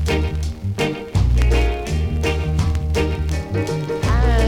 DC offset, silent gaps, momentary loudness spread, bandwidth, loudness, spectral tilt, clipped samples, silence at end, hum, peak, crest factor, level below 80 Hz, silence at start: under 0.1%; none; 6 LU; 13.5 kHz; -21 LUFS; -6.5 dB/octave; under 0.1%; 0 s; none; -2 dBFS; 16 dB; -20 dBFS; 0 s